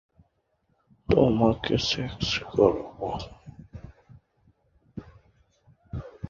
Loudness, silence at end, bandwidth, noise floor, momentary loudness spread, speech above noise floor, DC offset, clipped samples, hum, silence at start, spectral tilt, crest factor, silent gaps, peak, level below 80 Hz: -25 LUFS; 0 s; 7.4 kHz; -72 dBFS; 24 LU; 47 dB; under 0.1%; under 0.1%; none; 1.1 s; -6 dB/octave; 24 dB; none; -6 dBFS; -46 dBFS